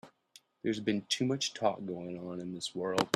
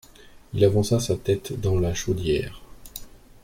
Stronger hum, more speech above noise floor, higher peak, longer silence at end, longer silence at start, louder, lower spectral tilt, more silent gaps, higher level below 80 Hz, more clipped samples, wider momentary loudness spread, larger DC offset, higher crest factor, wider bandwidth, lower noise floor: neither; about the same, 29 dB vs 26 dB; second, -10 dBFS vs -6 dBFS; second, 0.05 s vs 0.35 s; second, 0.05 s vs 0.35 s; second, -35 LUFS vs -24 LUFS; second, -4 dB/octave vs -6 dB/octave; neither; second, -74 dBFS vs -42 dBFS; neither; second, 9 LU vs 20 LU; neither; first, 24 dB vs 18 dB; second, 14 kHz vs 16.5 kHz; first, -63 dBFS vs -48 dBFS